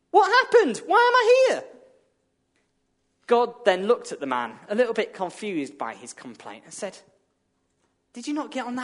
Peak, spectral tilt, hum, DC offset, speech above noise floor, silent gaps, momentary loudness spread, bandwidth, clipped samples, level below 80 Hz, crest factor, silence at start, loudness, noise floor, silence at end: -4 dBFS; -3.5 dB/octave; none; under 0.1%; 49 dB; none; 20 LU; 11 kHz; under 0.1%; -78 dBFS; 20 dB; 0.15 s; -22 LUFS; -72 dBFS; 0 s